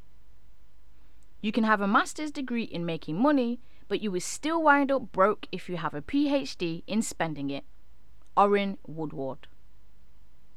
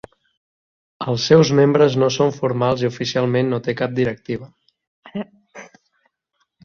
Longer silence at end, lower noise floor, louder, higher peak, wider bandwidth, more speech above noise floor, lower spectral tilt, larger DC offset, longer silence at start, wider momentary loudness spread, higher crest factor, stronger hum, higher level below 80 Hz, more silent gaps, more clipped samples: first, 1.2 s vs 1 s; second, -60 dBFS vs -70 dBFS; second, -28 LUFS vs -18 LUFS; second, -8 dBFS vs -2 dBFS; first, 14 kHz vs 7.2 kHz; second, 32 dB vs 53 dB; about the same, -5 dB/octave vs -6 dB/octave; first, 1% vs under 0.1%; first, 1.45 s vs 1 s; second, 12 LU vs 17 LU; about the same, 22 dB vs 18 dB; neither; about the same, -58 dBFS vs -56 dBFS; second, none vs 4.87-5.03 s; neither